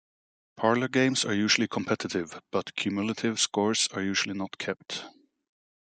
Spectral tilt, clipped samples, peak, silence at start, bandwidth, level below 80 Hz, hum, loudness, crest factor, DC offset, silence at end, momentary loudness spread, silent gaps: -3 dB/octave; under 0.1%; -8 dBFS; 0.55 s; 9.4 kHz; -74 dBFS; none; -28 LUFS; 22 dB; under 0.1%; 0.9 s; 10 LU; none